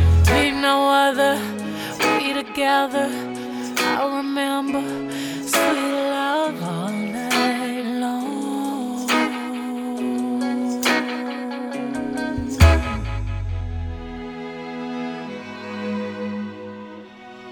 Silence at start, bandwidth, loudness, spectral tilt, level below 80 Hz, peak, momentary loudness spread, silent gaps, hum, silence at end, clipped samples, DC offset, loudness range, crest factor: 0 s; 18 kHz; -22 LUFS; -5 dB/octave; -32 dBFS; 0 dBFS; 15 LU; none; none; 0 s; under 0.1%; under 0.1%; 9 LU; 22 dB